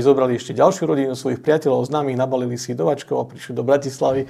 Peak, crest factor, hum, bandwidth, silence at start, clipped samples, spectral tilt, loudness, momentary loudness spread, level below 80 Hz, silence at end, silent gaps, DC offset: -2 dBFS; 18 dB; none; 14 kHz; 0 s; under 0.1%; -6 dB/octave; -20 LUFS; 8 LU; -60 dBFS; 0 s; none; under 0.1%